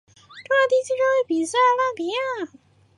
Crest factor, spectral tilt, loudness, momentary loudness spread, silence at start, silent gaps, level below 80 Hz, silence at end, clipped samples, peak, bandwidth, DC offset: 14 dB; -2.5 dB/octave; -21 LUFS; 9 LU; 0.3 s; none; -70 dBFS; 0.5 s; under 0.1%; -8 dBFS; 11.5 kHz; under 0.1%